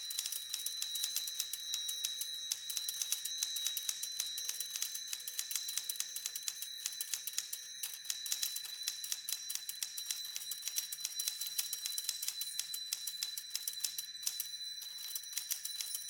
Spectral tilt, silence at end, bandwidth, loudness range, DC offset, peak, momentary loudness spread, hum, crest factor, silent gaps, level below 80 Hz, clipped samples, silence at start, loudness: 4.5 dB/octave; 0 s; 19 kHz; 2 LU; under 0.1%; -18 dBFS; 4 LU; none; 22 dB; none; -88 dBFS; under 0.1%; 0 s; -38 LUFS